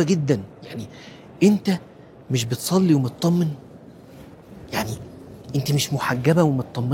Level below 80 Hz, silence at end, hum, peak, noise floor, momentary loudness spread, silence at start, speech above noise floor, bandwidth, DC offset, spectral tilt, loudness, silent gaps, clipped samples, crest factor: -54 dBFS; 0 s; none; -4 dBFS; -44 dBFS; 20 LU; 0 s; 23 dB; 17 kHz; under 0.1%; -6 dB/octave; -22 LUFS; none; under 0.1%; 18 dB